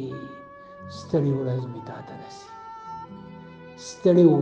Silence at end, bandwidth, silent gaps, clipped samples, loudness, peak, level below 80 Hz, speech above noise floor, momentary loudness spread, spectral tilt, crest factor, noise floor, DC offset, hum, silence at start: 0 s; 8.4 kHz; none; under 0.1%; -23 LUFS; -6 dBFS; -64 dBFS; 21 dB; 23 LU; -8 dB/octave; 20 dB; -44 dBFS; under 0.1%; none; 0 s